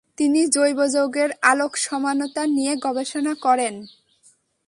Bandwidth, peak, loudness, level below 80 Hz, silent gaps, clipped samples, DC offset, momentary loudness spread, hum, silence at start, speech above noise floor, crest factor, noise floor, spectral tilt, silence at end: 11.5 kHz; -2 dBFS; -21 LUFS; -70 dBFS; none; under 0.1%; under 0.1%; 7 LU; none; 0.2 s; 38 dB; 20 dB; -59 dBFS; -1.5 dB/octave; 0.8 s